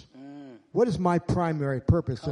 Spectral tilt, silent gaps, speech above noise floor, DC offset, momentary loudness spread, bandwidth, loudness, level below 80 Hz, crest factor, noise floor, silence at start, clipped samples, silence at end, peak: -8 dB/octave; none; 20 dB; under 0.1%; 20 LU; 10.5 kHz; -26 LUFS; -42 dBFS; 18 dB; -45 dBFS; 0.15 s; under 0.1%; 0 s; -10 dBFS